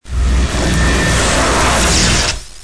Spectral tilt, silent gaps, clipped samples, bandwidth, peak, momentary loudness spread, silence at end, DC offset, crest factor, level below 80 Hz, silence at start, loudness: -3.5 dB/octave; none; under 0.1%; 11 kHz; -2 dBFS; 5 LU; 0.05 s; 3%; 12 dB; -18 dBFS; 0 s; -13 LUFS